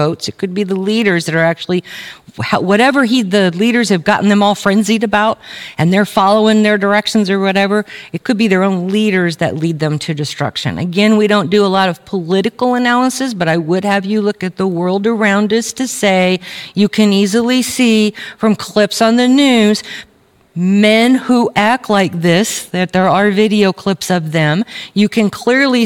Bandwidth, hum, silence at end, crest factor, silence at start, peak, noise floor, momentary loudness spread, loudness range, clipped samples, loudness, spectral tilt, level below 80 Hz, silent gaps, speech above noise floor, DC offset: 16.5 kHz; none; 0 s; 12 dB; 0 s; 0 dBFS; -37 dBFS; 8 LU; 2 LU; under 0.1%; -13 LUFS; -5 dB/octave; -54 dBFS; none; 25 dB; under 0.1%